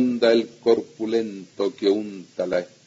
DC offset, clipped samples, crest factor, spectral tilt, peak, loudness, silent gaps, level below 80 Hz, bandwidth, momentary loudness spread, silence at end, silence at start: under 0.1%; under 0.1%; 18 dB; -5.5 dB/octave; -6 dBFS; -23 LUFS; none; -70 dBFS; 7.8 kHz; 10 LU; 0.2 s; 0 s